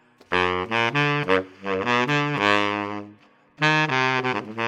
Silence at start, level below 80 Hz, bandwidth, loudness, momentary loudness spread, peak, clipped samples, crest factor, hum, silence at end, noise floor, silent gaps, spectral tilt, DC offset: 0.3 s; -64 dBFS; 11.5 kHz; -22 LUFS; 7 LU; -2 dBFS; under 0.1%; 22 dB; none; 0 s; -52 dBFS; none; -5 dB/octave; under 0.1%